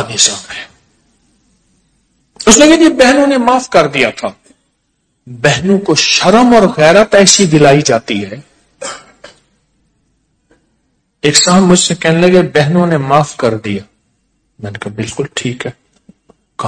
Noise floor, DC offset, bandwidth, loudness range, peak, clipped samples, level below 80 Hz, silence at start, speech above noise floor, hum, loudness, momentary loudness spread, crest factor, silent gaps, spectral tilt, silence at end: -63 dBFS; under 0.1%; 11 kHz; 9 LU; 0 dBFS; 2%; -42 dBFS; 0 s; 54 dB; none; -9 LUFS; 19 LU; 12 dB; none; -4 dB/octave; 0 s